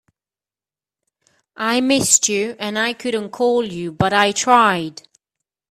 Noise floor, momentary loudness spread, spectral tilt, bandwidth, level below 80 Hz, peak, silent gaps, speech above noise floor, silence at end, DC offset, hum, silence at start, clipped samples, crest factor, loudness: under -90 dBFS; 11 LU; -2.5 dB/octave; 15.5 kHz; -56 dBFS; 0 dBFS; none; over 72 dB; 0.8 s; under 0.1%; none; 1.6 s; under 0.1%; 20 dB; -17 LUFS